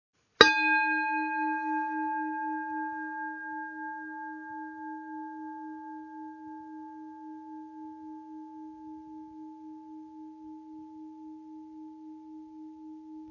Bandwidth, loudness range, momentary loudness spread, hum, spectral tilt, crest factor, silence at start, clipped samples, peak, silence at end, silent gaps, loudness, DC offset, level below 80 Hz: 7 kHz; 17 LU; 21 LU; none; 0.5 dB/octave; 34 dB; 0.4 s; under 0.1%; 0 dBFS; 0 s; none; -29 LUFS; under 0.1%; -70 dBFS